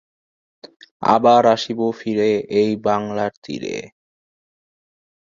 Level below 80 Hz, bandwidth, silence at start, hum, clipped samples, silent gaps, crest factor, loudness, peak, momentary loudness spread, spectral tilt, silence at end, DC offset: -62 dBFS; 7.6 kHz; 0.65 s; none; under 0.1%; 0.76-0.80 s, 0.91-1.00 s, 3.37-3.42 s; 18 dB; -18 LUFS; -2 dBFS; 14 LU; -5.5 dB/octave; 1.35 s; under 0.1%